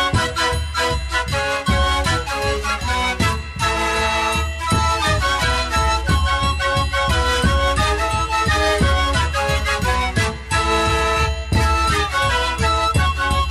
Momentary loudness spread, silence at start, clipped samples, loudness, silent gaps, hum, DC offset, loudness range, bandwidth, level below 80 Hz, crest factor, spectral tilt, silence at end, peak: 3 LU; 0 s; under 0.1%; -18 LUFS; none; none; under 0.1%; 2 LU; 14 kHz; -24 dBFS; 12 dB; -4 dB/octave; 0 s; -6 dBFS